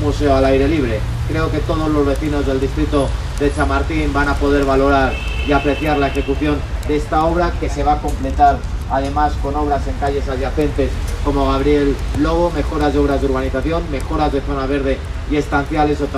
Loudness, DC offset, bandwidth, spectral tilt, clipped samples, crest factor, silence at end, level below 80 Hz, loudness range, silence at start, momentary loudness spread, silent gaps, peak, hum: -17 LUFS; under 0.1%; 13.5 kHz; -7 dB/octave; under 0.1%; 14 dB; 0 s; -22 dBFS; 2 LU; 0 s; 6 LU; none; -2 dBFS; none